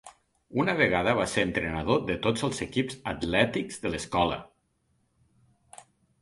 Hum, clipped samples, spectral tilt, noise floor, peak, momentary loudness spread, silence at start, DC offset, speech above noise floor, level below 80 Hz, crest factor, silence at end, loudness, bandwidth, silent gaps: none; under 0.1%; -5 dB/octave; -72 dBFS; -6 dBFS; 9 LU; 0.05 s; under 0.1%; 45 dB; -50 dBFS; 22 dB; 0.4 s; -27 LUFS; 11.5 kHz; none